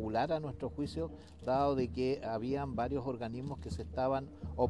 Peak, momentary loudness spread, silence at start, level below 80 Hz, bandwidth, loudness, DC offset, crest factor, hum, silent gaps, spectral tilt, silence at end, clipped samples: -18 dBFS; 9 LU; 0 s; -52 dBFS; 11.5 kHz; -37 LUFS; under 0.1%; 18 dB; none; none; -7.5 dB/octave; 0 s; under 0.1%